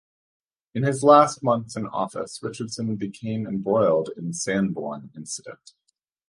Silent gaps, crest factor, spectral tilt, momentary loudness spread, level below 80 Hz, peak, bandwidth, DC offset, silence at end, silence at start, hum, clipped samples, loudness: none; 22 dB; -5.5 dB/octave; 18 LU; -64 dBFS; -2 dBFS; 11.5 kHz; under 0.1%; 0.75 s; 0.75 s; none; under 0.1%; -24 LUFS